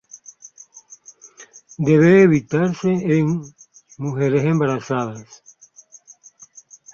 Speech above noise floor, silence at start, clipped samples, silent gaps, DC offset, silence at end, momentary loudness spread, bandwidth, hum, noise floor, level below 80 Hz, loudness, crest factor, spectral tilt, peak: 32 dB; 0.15 s; under 0.1%; none; under 0.1%; 1.7 s; 21 LU; 7.2 kHz; none; -49 dBFS; -58 dBFS; -18 LUFS; 18 dB; -7.5 dB/octave; -2 dBFS